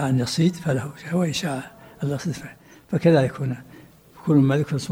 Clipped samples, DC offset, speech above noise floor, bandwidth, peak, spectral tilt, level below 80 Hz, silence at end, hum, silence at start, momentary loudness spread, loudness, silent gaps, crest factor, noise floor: under 0.1%; under 0.1%; 26 dB; 16.5 kHz; -6 dBFS; -6.5 dB/octave; -56 dBFS; 0 s; none; 0 s; 14 LU; -23 LUFS; none; 16 dB; -48 dBFS